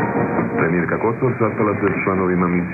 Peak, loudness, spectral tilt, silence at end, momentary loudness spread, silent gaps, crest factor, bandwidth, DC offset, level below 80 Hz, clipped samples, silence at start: -4 dBFS; -19 LUFS; -11.5 dB/octave; 0 s; 2 LU; none; 14 dB; 3 kHz; under 0.1%; -44 dBFS; under 0.1%; 0 s